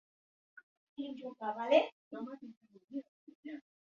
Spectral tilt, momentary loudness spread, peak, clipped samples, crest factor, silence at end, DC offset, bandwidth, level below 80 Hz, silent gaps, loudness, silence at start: -1.5 dB/octave; 22 LU; -16 dBFS; under 0.1%; 24 dB; 0.25 s; under 0.1%; 7.2 kHz; -88 dBFS; 0.63-0.96 s, 1.92-2.11 s, 2.57-2.61 s, 2.84-2.88 s, 3.08-3.27 s, 3.35-3.43 s; -37 LUFS; 0.55 s